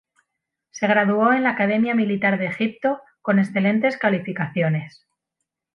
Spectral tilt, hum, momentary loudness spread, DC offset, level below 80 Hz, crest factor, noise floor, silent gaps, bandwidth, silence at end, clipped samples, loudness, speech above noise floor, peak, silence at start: -7 dB/octave; none; 8 LU; under 0.1%; -68 dBFS; 16 dB; -81 dBFS; none; 6.4 kHz; 0.85 s; under 0.1%; -21 LUFS; 61 dB; -4 dBFS; 0.75 s